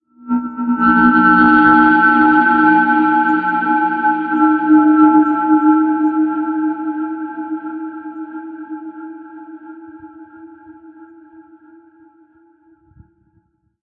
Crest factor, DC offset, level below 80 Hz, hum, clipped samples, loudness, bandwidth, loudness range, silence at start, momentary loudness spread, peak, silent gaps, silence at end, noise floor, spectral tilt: 14 dB; under 0.1%; -52 dBFS; none; under 0.1%; -13 LUFS; 4.7 kHz; 21 LU; 0.25 s; 20 LU; 0 dBFS; none; 2.8 s; -61 dBFS; -9 dB/octave